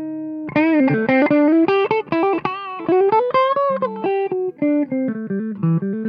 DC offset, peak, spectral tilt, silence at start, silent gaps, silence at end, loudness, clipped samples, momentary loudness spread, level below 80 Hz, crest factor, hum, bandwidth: under 0.1%; -6 dBFS; -9.5 dB/octave; 0 s; none; 0 s; -18 LUFS; under 0.1%; 9 LU; -60 dBFS; 12 dB; none; 5.4 kHz